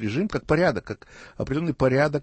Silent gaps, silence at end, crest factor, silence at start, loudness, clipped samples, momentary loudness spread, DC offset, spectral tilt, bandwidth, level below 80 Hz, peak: none; 0 s; 16 dB; 0 s; -24 LUFS; under 0.1%; 14 LU; under 0.1%; -7.5 dB/octave; 8.6 kHz; -46 dBFS; -8 dBFS